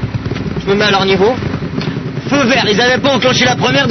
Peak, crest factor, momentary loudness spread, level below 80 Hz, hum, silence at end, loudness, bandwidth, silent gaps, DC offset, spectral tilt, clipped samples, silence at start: 0 dBFS; 12 dB; 9 LU; -36 dBFS; none; 0 s; -12 LUFS; 6.4 kHz; none; under 0.1%; -4.5 dB/octave; under 0.1%; 0 s